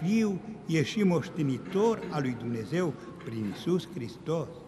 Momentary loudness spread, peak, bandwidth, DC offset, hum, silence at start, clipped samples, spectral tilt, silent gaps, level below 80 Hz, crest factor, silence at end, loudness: 10 LU; -14 dBFS; 13 kHz; under 0.1%; none; 0 s; under 0.1%; -6.5 dB/octave; none; -64 dBFS; 16 dB; 0 s; -31 LUFS